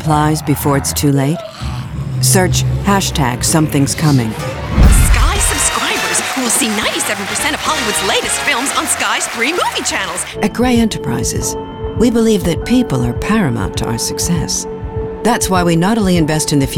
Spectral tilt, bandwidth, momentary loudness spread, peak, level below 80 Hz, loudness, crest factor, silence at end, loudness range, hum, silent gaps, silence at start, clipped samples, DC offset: -4 dB/octave; 19 kHz; 7 LU; 0 dBFS; -22 dBFS; -14 LUFS; 14 dB; 0 s; 2 LU; none; none; 0 s; under 0.1%; under 0.1%